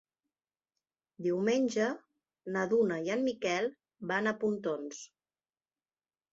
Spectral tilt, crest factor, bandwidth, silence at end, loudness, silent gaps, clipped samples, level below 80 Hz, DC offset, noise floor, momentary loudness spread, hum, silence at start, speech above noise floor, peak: -5 dB/octave; 18 dB; 8 kHz; 1.25 s; -32 LUFS; none; under 0.1%; -78 dBFS; under 0.1%; under -90 dBFS; 15 LU; none; 1.2 s; over 58 dB; -16 dBFS